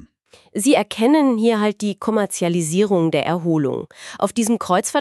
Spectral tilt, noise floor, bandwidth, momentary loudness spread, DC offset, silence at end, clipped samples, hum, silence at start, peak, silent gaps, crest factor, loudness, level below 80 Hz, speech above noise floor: -5 dB/octave; -53 dBFS; 13.5 kHz; 8 LU; under 0.1%; 0 s; under 0.1%; none; 0.55 s; -4 dBFS; none; 16 dB; -19 LUFS; -64 dBFS; 34 dB